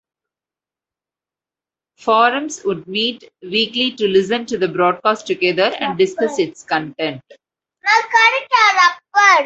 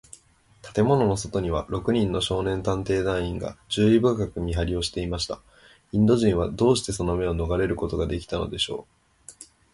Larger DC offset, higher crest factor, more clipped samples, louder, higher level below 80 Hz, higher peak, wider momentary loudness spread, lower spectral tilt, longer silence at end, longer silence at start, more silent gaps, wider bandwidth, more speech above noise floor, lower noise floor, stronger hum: neither; about the same, 16 dB vs 18 dB; neither; first, -16 LUFS vs -25 LUFS; second, -64 dBFS vs -40 dBFS; first, 0 dBFS vs -8 dBFS; about the same, 11 LU vs 10 LU; second, -3 dB/octave vs -6 dB/octave; second, 0 s vs 0.3 s; first, 2.05 s vs 0.65 s; neither; second, 8.2 kHz vs 11.5 kHz; first, 72 dB vs 33 dB; first, -89 dBFS vs -57 dBFS; neither